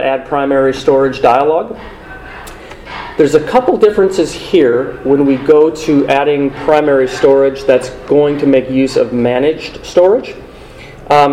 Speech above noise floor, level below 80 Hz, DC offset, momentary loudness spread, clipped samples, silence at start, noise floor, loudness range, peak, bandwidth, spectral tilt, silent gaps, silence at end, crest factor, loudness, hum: 22 dB; -40 dBFS; under 0.1%; 18 LU; 0.3%; 0 s; -33 dBFS; 3 LU; 0 dBFS; 12 kHz; -6 dB/octave; none; 0 s; 12 dB; -11 LUFS; none